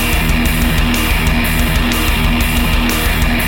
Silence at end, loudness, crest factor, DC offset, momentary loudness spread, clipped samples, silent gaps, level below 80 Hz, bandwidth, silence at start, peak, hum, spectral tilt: 0 s; -14 LUFS; 12 dB; under 0.1%; 0 LU; under 0.1%; none; -16 dBFS; 17.5 kHz; 0 s; -2 dBFS; none; -4 dB/octave